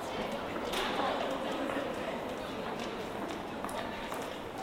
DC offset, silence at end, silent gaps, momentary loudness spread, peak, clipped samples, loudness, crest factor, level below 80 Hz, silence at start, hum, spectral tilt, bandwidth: under 0.1%; 0 s; none; 6 LU; -18 dBFS; under 0.1%; -36 LUFS; 18 dB; -58 dBFS; 0 s; none; -4 dB/octave; 16 kHz